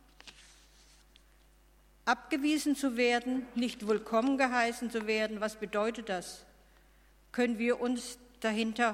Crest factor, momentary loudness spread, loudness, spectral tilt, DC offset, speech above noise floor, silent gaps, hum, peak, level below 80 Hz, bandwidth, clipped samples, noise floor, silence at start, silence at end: 20 dB; 11 LU; -32 LUFS; -3.5 dB/octave; under 0.1%; 31 dB; none; none; -12 dBFS; -64 dBFS; 16 kHz; under 0.1%; -63 dBFS; 0.25 s; 0 s